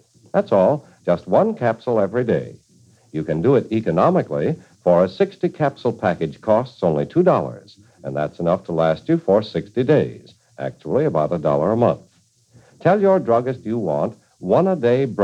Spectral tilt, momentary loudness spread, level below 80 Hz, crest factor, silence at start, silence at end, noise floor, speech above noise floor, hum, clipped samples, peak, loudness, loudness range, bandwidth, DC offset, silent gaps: -8.5 dB/octave; 9 LU; -56 dBFS; 16 dB; 0.35 s; 0 s; -55 dBFS; 37 dB; none; under 0.1%; -2 dBFS; -19 LUFS; 1 LU; 9 kHz; under 0.1%; none